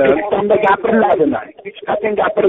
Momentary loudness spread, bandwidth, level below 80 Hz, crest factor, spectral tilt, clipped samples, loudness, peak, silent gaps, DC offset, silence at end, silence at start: 11 LU; 4 kHz; -50 dBFS; 12 dB; -4 dB/octave; under 0.1%; -15 LUFS; -2 dBFS; none; under 0.1%; 0 s; 0 s